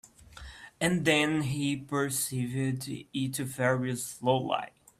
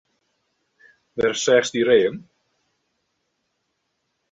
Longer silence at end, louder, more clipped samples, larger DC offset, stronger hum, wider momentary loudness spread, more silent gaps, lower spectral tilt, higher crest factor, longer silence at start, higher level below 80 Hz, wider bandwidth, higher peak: second, 0.3 s vs 2.1 s; second, -30 LUFS vs -19 LUFS; neither; neither; neither; second, 11 LU vs 15 LU; neither; about the same, -4.5 dB/octave vs -3.5 dB/octave; about the same, 20 dB vs 20 dB; second, 0.05 s vs 1.15 s; about the same, -60 dBFS vs -62 dBFS; first, 15.5 kHz vs 8 kHz; second, -10 dBFS vs -4 dBFS